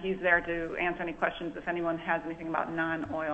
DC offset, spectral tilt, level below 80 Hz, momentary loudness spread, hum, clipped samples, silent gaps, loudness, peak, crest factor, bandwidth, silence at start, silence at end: under 0.1%; -7 dB/octave; -54 dBFS; 8 LU; none; under 0.1%; none; -31 LUFS; -10 dBFS; 20 dB; 8.2 kHz; 0 s; 0 s